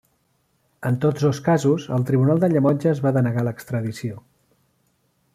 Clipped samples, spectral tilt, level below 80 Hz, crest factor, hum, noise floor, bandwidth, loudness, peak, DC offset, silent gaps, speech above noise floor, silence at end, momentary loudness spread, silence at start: under 0.1%; -8 dB/octave; -60 dBFS; 16 dB; none; -67 dBFS; 14 kHz; -21 LUFS; -6 dBFS; under 0.1%; none; 47 dB; 1.15 s; 11 LU; 0.8 s